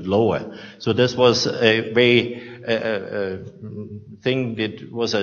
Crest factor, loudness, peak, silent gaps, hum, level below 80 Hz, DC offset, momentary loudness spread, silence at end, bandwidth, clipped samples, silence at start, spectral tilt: 20 dB; -20 LUFS; 0 dBFS; none; none; -60 dBFS; under 0.1%; 18 LU; 0 s; 7.2 kHz; under 0.1%; 0 s; -5 dB/octave